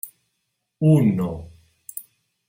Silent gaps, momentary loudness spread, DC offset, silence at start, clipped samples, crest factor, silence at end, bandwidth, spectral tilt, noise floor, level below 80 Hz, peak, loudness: none; 21 LU; under 0.1%; 0.05 s; under 0.1%; 18 dB; 0.45 s; 16.5 kHz; -8.5 dB/octave; -76 dBFS; -54 dBFS; -6 dBFS; -20 LUFS